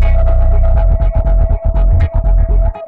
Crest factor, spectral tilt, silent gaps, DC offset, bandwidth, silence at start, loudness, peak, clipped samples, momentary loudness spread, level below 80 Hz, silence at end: 6 dB; -10.5 dB/octave; none; under 0.1%; 3.1 kHz; 0 s; -14 LUFS; -4 dBFS; under 0.1%; 2 LU; -10 dBFS; 0 s